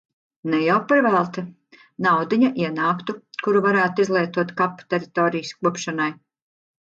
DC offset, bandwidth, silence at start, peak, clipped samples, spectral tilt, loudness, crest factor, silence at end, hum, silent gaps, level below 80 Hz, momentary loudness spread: under 0.1%; 7.8 kHz; 0.45 s; -6 dBFS; under 0.1%; -6 dB/octave; -21 LUFS; 16 dB; 0.8 s; none; none; -70 dBFS; 10 LU